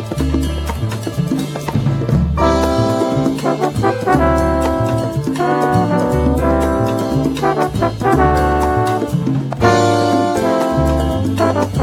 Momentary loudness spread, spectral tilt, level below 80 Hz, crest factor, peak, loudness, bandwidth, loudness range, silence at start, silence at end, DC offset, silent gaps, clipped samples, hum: 6 LU; -7 dB/octave; -26 dBFS; 14 dB; 0 dBFS; -16 LUFS; 17 kHz; 2 LU; 0 s; 0 s; under 0.1%; none; under 0.1%; none